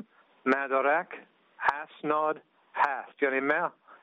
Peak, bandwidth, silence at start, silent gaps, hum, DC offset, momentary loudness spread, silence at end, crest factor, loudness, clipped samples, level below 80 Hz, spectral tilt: -8 dBFS; 5.4 kHz; 0 s; none; none; under 0.1%; 12 LU; 0.1 s; 22 dB; -29 LUFS; under 0.1%; -78 dBFS; -2.5 dB/octave